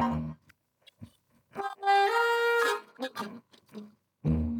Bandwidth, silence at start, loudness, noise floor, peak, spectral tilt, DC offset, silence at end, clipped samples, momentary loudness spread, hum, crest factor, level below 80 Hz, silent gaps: 19 kHz; 0 s; -28 LUFS; -66 dBFS; -14 dBFS; -5.5 dB/octave; under 0.1%; 0 s; under 0.1%; 24 LU; none; 16 dB; -50 dBFS; none